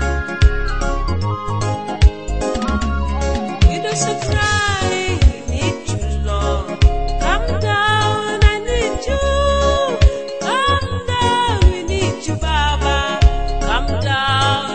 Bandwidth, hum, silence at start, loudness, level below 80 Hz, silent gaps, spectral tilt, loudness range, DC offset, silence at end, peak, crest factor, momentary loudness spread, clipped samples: 8.8 kHz; none; 0 s; -17 LUFS; -20 dBFS; none; -4.5 dB/octave; 2 LU; under 0.1%; 0 s; 0 dBFS; 16 dB; 6 LU; under 0.1%